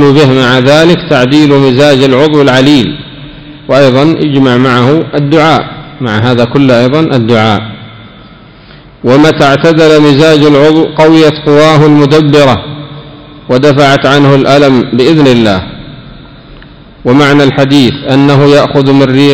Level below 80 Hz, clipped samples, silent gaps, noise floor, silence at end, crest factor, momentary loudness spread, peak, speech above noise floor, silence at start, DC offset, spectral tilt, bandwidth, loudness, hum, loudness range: -36 dBFS; 20%; none; -33 dBFS; 0 s; 6 dB; 9 LU; 0 dBFS; 28 dB; 0 s; 0.9%; -6.5 dB/octave; 8 kHz; -5 LUFS; none; 4 LU